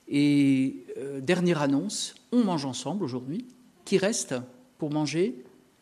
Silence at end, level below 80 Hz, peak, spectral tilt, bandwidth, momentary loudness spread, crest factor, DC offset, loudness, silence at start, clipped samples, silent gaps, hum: 0.4 s; -72 dBFS; -10 dBFS; -5 dB/octave; 13.5 kHz; 13 LU; 18 dB; under 0.1%; -27 LUFS; 0.05 s; under 0.1%; none; none